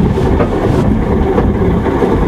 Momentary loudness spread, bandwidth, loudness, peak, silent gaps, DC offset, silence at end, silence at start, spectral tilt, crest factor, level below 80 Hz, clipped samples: 1 LU; 13 kHz; -12 LUFS; 0 dBFS; none; under 0.1%; 0 s; 0 s; -8.5 dB/octave; 12 dB; -18 dBFS; under 0.1%